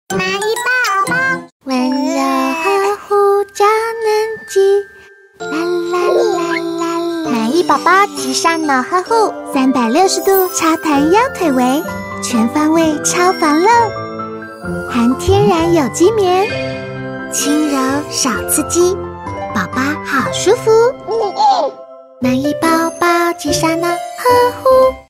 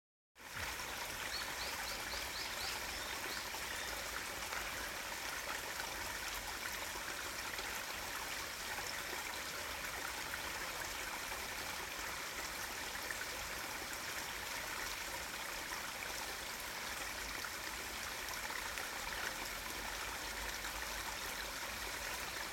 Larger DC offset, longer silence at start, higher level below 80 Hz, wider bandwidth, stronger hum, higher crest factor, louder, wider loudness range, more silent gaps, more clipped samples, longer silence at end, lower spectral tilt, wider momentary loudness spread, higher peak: neither; second, 0.1 s vs 0.35 s; first, -44 dBFS vs -60 dBFS; about the same, 16 kHz vs 17 kHz; neither; second, 14 dB vs 20 dB; first, -14 LUFS vs -41 LUFS; about the same, 3 LU vs 1 LU; first, 1.52-1.60 s vs none; neither; about the same, 0.05 s vs 0 s; first, -4 dB/octave vs -1 dB/octave; first, 9 LU vs 2 LU; first, 0 dBFS vs -24 dBFS